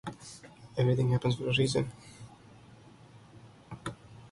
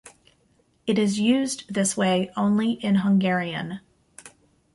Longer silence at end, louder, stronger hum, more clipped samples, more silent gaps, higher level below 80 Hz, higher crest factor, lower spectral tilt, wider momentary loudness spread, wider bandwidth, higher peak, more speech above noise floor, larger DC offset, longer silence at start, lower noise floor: second, 0.05 s vs 0.45 s; second, -31 LUFS vs -23 LUFS; neither; neither; neither; about the same, -60 dBFS vs -64 dBFS; about the same, 18 dB vs 14 dB; about the same, -6 dB/octave vs -5 dB/octave; first, 23 LU vs 11 LU; about the same, 11.5 kHz vs 11.5 kHz; second, -16 dBFS vs -10 dBFS; second, 25 dB vs 42 dB; neither; about the same, 0.05 s vs 0.05 s; second, -55 dBFS vs -64 dBFS